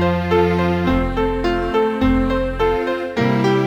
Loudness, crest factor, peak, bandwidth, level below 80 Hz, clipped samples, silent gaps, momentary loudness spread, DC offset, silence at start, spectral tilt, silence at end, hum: -18 LUFS; 14 dB; -4 dBFS; 15 kHz; -28 dBFS; under 0.1%; none; 4 LU; under 0.1%; 0 s; -7.5 dB/octave; 0 s; none